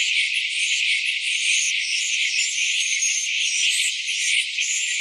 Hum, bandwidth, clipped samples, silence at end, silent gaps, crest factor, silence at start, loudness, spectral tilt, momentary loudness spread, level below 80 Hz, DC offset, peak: none; 14 kHz; under 0.1%; 0 s; none; 14 dB; 0 s; -19 LUFS; 15.5 dB/octave; 3 LU; under -90 dBFS; under 0.1%; -8 dBFS